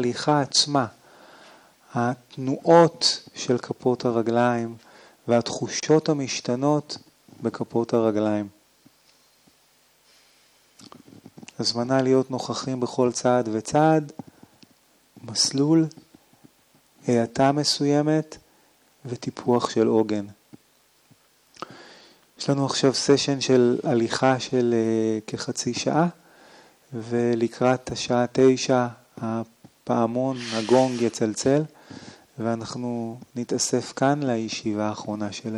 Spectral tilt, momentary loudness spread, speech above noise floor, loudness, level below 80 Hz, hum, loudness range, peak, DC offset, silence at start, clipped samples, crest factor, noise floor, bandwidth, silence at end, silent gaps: -5 dB/octave; 14 LU; 39 dB; -23 LUFS; -66 dBFS; none; 5 LU; -2 dBFS; under 0.1%; 0 s; under 0.1%; 22 dB; -61 dBFS; 12.5 kHz; 0 s; none